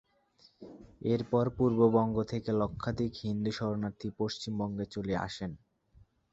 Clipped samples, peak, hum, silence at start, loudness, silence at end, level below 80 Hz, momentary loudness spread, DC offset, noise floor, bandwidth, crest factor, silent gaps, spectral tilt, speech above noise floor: under 0.1%; -12 dBFS; none; 0.6 s; -32 LUFS; 0.75 s; -56 dBFS; 14 LU; under 0.1%; -66 dBFS; 8 kHz; 20 dB; none; -7.5 dB/octave; 34 dB